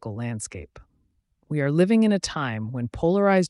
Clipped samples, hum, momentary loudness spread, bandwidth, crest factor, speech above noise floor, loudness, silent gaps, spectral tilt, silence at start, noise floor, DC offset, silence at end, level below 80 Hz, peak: under 0.1%; none; 13 LU; 11.5 kHz; 14 dB; 45 dB; -24 LUFS; none; -6 dB/octave; 0.05 s; -68 dBFS; under 0.1%; 0 s; -50 dBFS; -10 dBFS